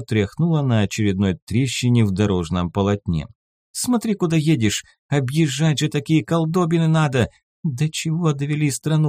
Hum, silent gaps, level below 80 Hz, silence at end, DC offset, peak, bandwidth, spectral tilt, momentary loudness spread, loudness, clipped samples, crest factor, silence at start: none; 1.42-1.47 s, 3.35-3.74 s, 4.99-5.09 s, 7.43-7.63 s; -48 dBFS; 0 s; under 0.1%; -4 dBFS; 15.5 kHz; -6 dB/octave; 7 LU; -20 LUFS; under 0.1%; 14 dB; 0 s